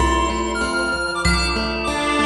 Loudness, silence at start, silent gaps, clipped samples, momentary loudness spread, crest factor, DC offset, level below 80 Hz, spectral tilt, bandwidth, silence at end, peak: -20 LUFS; 0 s; none; under 0.1%; 3 LU; 14 dB; under 0.1%; -28 dBFS; -4 dB/octave; 11.5 kHz; 0 s; -4 dBFS